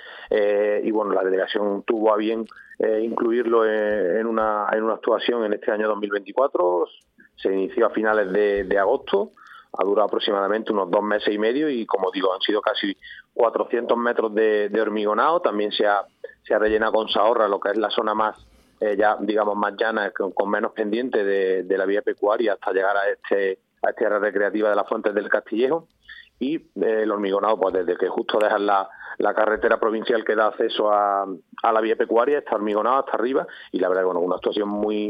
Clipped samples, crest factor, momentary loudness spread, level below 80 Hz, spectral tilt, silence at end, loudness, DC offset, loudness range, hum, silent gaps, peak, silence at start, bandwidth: under 0.1%; 18 dB; 6 LU; -60 dBFS; -7 dB/octave; 0 s; -22 LUFS; under 0.1%; 2 LU; none; none; -4 dBFS; 0 s; 5.2 kHz